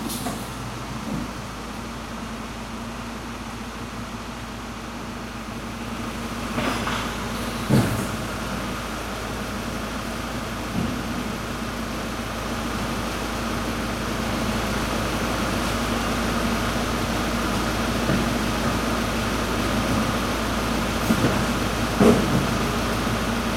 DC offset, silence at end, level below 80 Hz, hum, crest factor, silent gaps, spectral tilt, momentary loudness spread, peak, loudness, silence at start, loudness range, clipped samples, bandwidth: under 0.1%; 0 s; -36 dBFS; none; 22 dB; none; -4.5 dB/octave; 11 LU; -4 dBFS; -25 LUFS; 0 s; 10 LU; under 0.1%; 16.5 kHz